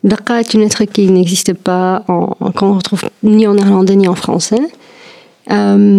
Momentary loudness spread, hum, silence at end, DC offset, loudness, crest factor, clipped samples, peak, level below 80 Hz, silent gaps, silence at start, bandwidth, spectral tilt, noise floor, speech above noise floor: 7 LU; none; 0 s; under 0.1%; -11 LUFS; 10 dB; under 0.1%; 0 dBFS; -54 dBFS; none; 0.05 s; 14 kHz; -5.5 dB/octave; -39 dBFS; 29 dB